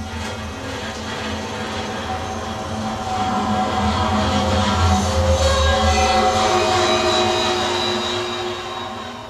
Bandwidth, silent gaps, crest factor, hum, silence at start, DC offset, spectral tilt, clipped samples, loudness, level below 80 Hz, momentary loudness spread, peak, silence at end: 13.5 kHz; none; 16 dB; none; 0 s; under 0.1%; -4.5 dB/octave; under 0.1%; -20 LUFS; -30 dBFS; 11 LU; -4 dBFS; 0 s